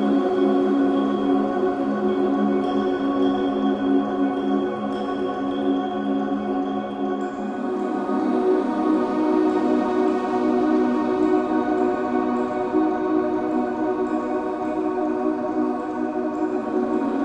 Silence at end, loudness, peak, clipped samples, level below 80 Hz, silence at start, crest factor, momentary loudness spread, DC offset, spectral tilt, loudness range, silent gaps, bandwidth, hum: 0 s; -22 LUFS; -8 dBFS; under 0.1%; -56 dBFS; 0 s; 14 dB; 5 LU; under 0.1%; -7.5 dB/octave; 3 LU; none; 8.6 kHz; none